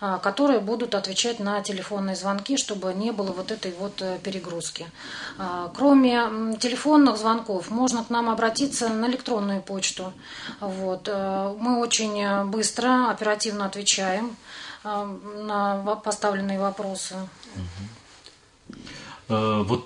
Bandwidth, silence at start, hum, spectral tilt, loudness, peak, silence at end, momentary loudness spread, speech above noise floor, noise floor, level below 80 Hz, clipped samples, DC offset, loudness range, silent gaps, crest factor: 11 kHz; 0 s; none; -3.5 dB/octave; -25 LUFS; -6 dBFS; 0 s; 15 LU; 27 dB; -52 dBFS; -62 dBFS; under 0.1%; under 0.1%; 7 LU; none; 18 dB